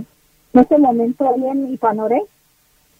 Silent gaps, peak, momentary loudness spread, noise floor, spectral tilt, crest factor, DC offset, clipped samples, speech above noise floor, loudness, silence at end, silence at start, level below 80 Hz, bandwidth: none; 0 dBFS; 8 LU; -57 dBFS; -8.5 dB/octave; 18 dB; under 0.1%; under 0.1%; 42 dB; -16 LUFS; 0.75 s; 0 s; -52 dBFS; 4.6 kHz